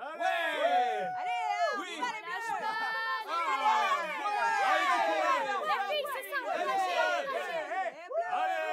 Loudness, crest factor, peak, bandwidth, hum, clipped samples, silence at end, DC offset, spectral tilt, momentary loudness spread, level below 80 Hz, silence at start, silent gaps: -31 LUFS; 16 dB; -16 dBFS; 16 kHz; none; under 0.1%; 0 s; under 0.1%; -1.5 dB/octave; 8 LU; under -90 dBFS; 0 s; none